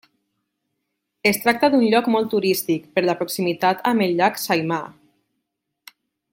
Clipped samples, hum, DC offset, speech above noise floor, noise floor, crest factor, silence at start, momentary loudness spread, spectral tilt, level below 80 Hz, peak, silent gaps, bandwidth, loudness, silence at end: under 0.1%; none; under 0.1%; 59 dB; -78 dBFS; 20 dB; 1.25 s; 6 LU; -4.5 dB/octave; -66 dBFS; -2 dBFS; none; 17 kHz; -20 LUFS; 1.4 s